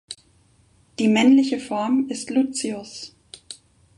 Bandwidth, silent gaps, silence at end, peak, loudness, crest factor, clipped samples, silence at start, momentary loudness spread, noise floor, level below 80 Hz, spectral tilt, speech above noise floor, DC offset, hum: 11.5 kHz; none; 0.45 s; -4 dBFS; -20 LUFS; 18 dB; under 0.1%; 0.1 s; 23 LU; -58 dBFS; -64 dBFS; -4 dB/octave; 38 dB; under 0.1%; none